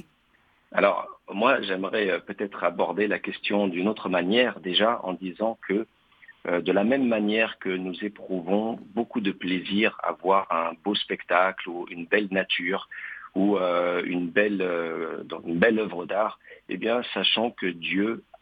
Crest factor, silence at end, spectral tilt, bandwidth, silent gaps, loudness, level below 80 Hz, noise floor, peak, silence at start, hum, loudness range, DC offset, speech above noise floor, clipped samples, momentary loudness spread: 24 dB; 0.2 s; -8 dB/octave; 5 kHz; none; -26 LUFS; -70 dBFS; -64 dBFS; -2 dBFS; 0.7 s; none; 1 LU; under 0.1%; 38 dB; under 0.1%; 10 LU